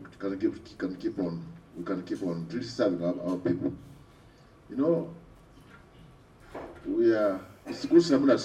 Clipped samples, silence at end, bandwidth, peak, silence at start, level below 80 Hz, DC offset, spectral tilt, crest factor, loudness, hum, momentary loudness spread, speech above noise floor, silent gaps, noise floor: under 0.1%; 0 s; 9 kHz; -8 dBFS; 0 s; -60 dBFS; under 0.1%; -6.5 dB/octave; 20 dB; -29 LUFS; none; 18 LU; 28 dB; none; -55 dBFS